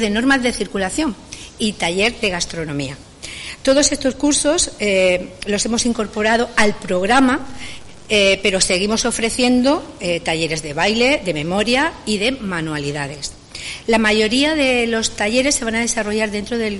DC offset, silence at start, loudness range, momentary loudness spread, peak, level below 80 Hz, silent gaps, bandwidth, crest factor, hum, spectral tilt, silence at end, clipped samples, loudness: under 0.1%; 0 s; 3 LU; 12 LU; -2 dBFS; -40 dBFS; none; 11.5 kHz; 16 dB; none; -3 dB/octave; 0 s; under 0.1%; -17 LUFS